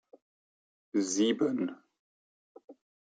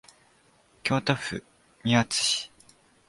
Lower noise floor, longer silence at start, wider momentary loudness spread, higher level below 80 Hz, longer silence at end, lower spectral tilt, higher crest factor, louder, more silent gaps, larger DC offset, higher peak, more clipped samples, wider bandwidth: first, under -90 dBFS vs -62 dBFS; about the same, 0.95 s vs 0.85 s; second, 7 LU vs 13 LU; second, -84 dBFS vs -60 dBFS; second, 0.4 s vs 0.6 s; about the same, -4 dB/octave vs -3.5 dB/octave; about the same, 18 dB vs 22 dB; second, -31 LUFS vs -26 LUFS; first, 1.99-2.55 s, 2.64-2.68 s vs none; neither; second, -16 dBFS vs -8 dBFS; neither; second, 9.4 kHz vs 11.5 kHz